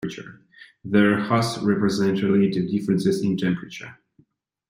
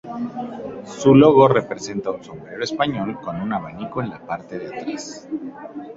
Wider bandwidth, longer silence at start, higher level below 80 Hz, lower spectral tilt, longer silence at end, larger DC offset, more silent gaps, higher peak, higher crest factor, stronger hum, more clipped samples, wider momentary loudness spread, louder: first, 15.5 kHz vs 7.8 kHz; about the same, 0 s vs 0.05 s; second, -60 dBFS vs -54 dBFS; about the same, -6.5 dB/octave vs -6.5 dB/octave; first, 0.75 s vs 0 s; neither; neither; second, -6 dBFS vs -2 dBFS; about the same, 18 dB vs 20 dB; neither; neither; about the same, 18 LU vs 20 LU; about the same, -22 LUFS vs -20 LUFS